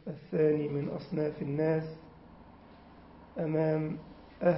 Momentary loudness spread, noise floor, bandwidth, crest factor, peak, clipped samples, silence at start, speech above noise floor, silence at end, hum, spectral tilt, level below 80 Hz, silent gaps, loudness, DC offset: 16 LU; -54 dBFS; 5.6 kHz; 18 dB; -14 dBFS; under 0.1%; 0.05 s; 23 dB; 0 s; none; -8.5 dB/octave; -62 dBFS; none; -32 LUFS; under 0.1%